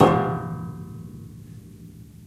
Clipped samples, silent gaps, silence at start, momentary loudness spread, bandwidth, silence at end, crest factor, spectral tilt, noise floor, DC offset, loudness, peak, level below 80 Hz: under 0.1%; none; 0 s; 21 LU; 14.5 kHz; 0 s; 24 dB; -7.5 dB/octave; -44 dBFS; under 0.1%; -26 LUFS; -2 dBFS; -50 dBFS